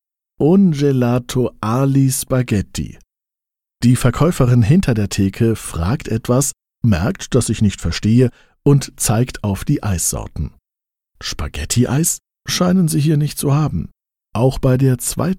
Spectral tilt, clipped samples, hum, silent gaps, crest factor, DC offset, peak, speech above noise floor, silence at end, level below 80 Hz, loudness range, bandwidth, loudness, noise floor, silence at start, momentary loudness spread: -6 dB/octave; under 0.1%; none; none; 14 dB; under 0.1%; -2 dBFS; 71 dB; 0 s; -34 dBFS; 3 LU; 16.5 kHz; -17 LUFS; -86 dBFS; 0.4 s; 10 LU